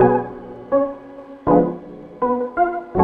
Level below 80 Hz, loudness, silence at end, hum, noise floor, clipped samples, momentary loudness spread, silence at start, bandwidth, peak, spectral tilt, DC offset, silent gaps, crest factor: -46 dBFS; -20 LUFS; 0 s; none; -38 dBFS; under 0.1%; 19 LU; 0 s; 4.2 kHz; -2 dBFS; -11 dB/octave; under 0.1%; none; 18 dB